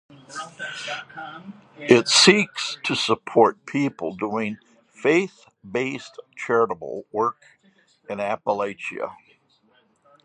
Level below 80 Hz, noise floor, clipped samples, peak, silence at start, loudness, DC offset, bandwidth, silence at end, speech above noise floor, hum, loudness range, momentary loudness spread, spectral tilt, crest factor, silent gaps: -68 dBFS; -62 dBFS; under 0.1%; 0 dBFS; 0.3 s; -22 LUFS; under 0.1%; 11 kHz; 1.1 s; 39 dB; none; 8 LU; 20 LU; -3 dB/octave; 24 dB; none